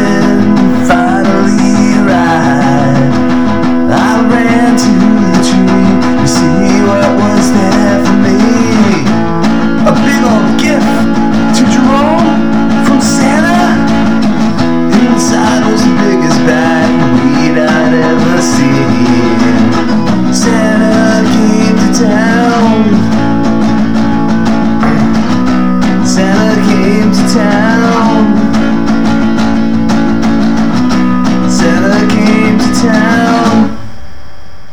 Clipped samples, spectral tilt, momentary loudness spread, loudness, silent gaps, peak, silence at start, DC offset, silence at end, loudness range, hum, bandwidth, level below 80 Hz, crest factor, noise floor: 0.4%; -5.5 dB/octave; 3 LU; -8 LUFS; none; 0 dBFS; 0 s; 10%; 0.15 s; 1 LU; none; 13 kHz; -32 dBFS; 8 dB; -32 dBFS